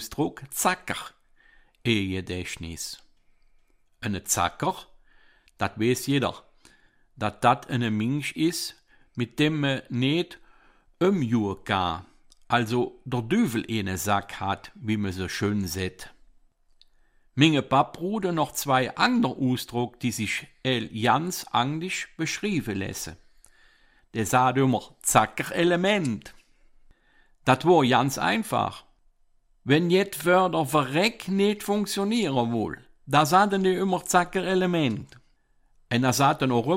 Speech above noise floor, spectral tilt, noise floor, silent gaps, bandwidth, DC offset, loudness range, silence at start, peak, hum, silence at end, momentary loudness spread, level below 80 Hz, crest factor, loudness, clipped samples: 38 dB; -4.5 dB/octave; -63 dBFS; none; 16 kHz; under 0.1%; 6 LU; 0 s; -4 dBFS; none; 0 s; 12 LU; -56 dBFS; 22 dB; -25 LUFS; under 0.1%